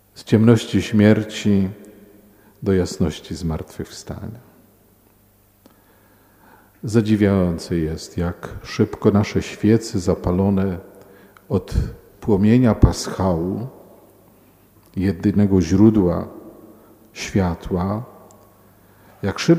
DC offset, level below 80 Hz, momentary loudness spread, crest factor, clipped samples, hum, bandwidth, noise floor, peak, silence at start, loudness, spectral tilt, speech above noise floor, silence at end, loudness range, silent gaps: under 0.1%; -36 dBFS; 18 LU; 20 dB; under 0.1%; none; 16 kHz; -55 dBFS; 0 dBFS; 0.15 s; -19 LUFS; -7 dB/octave; 37 dB; 0 s; 7 LU; none